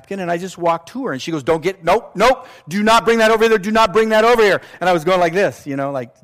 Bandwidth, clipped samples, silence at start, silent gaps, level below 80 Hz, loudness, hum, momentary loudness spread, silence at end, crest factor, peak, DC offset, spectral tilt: 15.5 kHz; under 0.1%; 0.1 s; none; -46 dBFS; -16 LUFS; none; 10 LU; 0.15 s; 12 dB; -4 dBFS; under 0.1%; -4.5 dB/octave